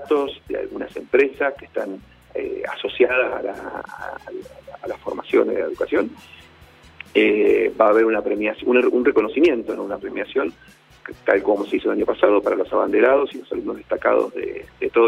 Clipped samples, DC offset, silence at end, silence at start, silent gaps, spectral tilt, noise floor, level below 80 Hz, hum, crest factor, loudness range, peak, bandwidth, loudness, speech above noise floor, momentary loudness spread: under 0.1%; under 0.1%; 0 s; 0 s; none; -6 dB/octave; -48 dBFS; -54 dBFS; none; 20 dB; 7 LU; 0 dBFS; 11 kHz; -20 LUFS; 28 dB; 16 LU